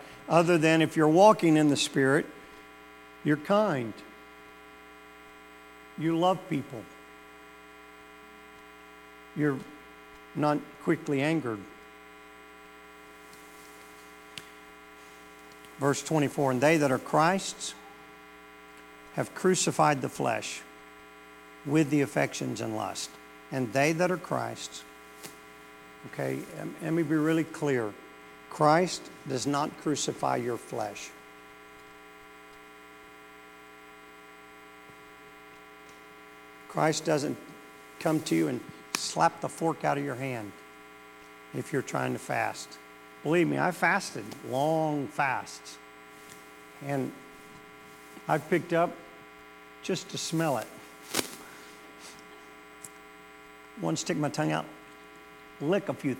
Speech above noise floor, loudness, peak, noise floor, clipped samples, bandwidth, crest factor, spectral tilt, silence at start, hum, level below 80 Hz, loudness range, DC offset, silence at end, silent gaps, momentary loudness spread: 23 dB; -29 LUFS; -6 dBFS; -51 dBFS; under 0.1%; 17.5 kHz; 24 dB; -5 dB/octave; 0 s; none; -70 dBFS; 12 LU; under 0.1%; 0 s; none; 24 LU